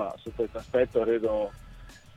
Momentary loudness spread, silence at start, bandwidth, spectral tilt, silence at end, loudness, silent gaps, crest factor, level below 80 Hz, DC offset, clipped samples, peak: 9 LU; 0 s; 11 kHz; -7 dB/octave; 0.2 s; -28 LUFS; none; 18 dB; -50 dBFS; under 0.1%; under 0.1%; -12 dBFS